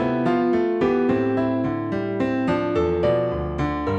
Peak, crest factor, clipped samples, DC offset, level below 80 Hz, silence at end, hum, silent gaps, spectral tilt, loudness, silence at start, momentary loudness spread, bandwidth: -8 dBFS; 12 dB; under 0.1%; under 0.1%; -42 dBFS; 0 s; none; none; -8.5 dB/octave; -22 LUFS; 0 s; 5 LU; 8 kHz